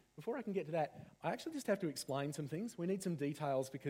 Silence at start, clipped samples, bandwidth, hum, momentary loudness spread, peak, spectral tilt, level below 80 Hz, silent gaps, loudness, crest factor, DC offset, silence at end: 0.15 s; under 0.1%; 16.5 kHz; none; 5 LU; -24 dBFS; -6 dB/octave; -80 dBFS; none; -41 LUFS; 16 dB; under 0.1%; 0 s